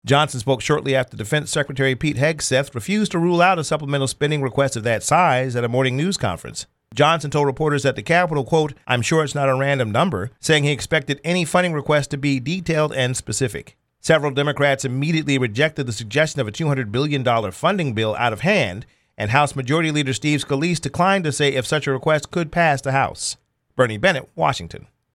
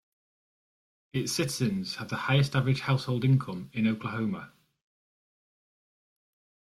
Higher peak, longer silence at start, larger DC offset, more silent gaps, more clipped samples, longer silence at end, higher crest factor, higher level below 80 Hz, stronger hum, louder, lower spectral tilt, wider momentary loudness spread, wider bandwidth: first, 0 dBFS vs -12 dBFS; second, 0.05 s vs 1.15 s; neither; neither; neither; second, 0.35 s vs 2.3 s; about the same, 18 dB vs 18 dB; first, -52 dBFS vs -64 dBFS; neither; first, -20 LUFS vs -29 LUFS; about the same, -5 dB/octave vs -5.5 dB/octave; about the same, 6 LU vs 8 LU; about the same, 13.5 kHz vs 13.5 kHz